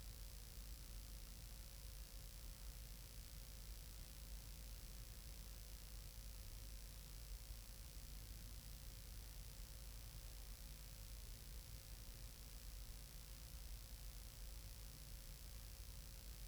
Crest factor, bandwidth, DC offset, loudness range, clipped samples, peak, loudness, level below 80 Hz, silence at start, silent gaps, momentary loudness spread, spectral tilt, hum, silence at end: 16 dB; over 20 kHz; under 0.1%; 0 LU; under 0.1%; -38 dBFS; -57 LUFS; -56 dBFS; 0 s; none; 1 LU; -3 dB/octave; none; 0 s